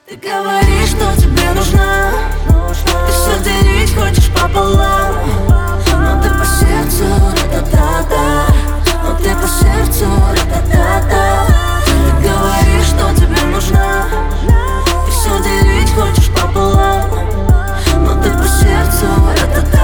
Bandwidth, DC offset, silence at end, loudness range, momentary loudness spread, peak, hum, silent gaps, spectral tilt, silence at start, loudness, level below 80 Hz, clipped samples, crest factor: over 20 kHz; under 0.1%; 0 s; 1 LU; 4 LU; 0 dBFS; none; none; -5 dB/octave; 0.1 s; -12 LUFS; -12 dBFS; under 0.1%; 10 dB